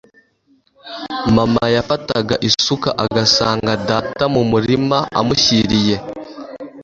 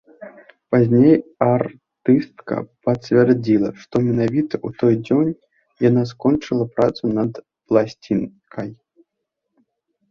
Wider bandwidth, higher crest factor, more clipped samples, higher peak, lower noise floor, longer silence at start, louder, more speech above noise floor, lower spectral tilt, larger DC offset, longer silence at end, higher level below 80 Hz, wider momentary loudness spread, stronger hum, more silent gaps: first, 7.8 kHz vs 7 kHz; about the same, 16 dB vs 18 dB; neither; about the same, 0 dBFS vs -2 dBFS; second, -58 dBFS vs -78 dBFS; first, 0.85 s vs 0.2 s; first, -15 LUFS vs -19 LUFS; second, 42 dB vs 60 dB; second, -4.5 dB/octave vs -9 dB/octave; neither; second, 0 s vs 1.35 s; first, -42 dBFS vs -56 dBFS; first, 18 LU vs 12 LU; neither; neither